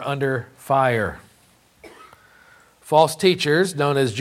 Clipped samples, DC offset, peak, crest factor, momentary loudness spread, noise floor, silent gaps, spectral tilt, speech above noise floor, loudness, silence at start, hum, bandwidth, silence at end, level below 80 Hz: under 0.1%; under 0.1%; -2 dBFS; 20 dB; 7 LU; -56 dBFS; none; -5 dB/octave; 37 dB; -20 LUFS; 0 s; none; 15.5 kHz; 0 s; -56 dBFS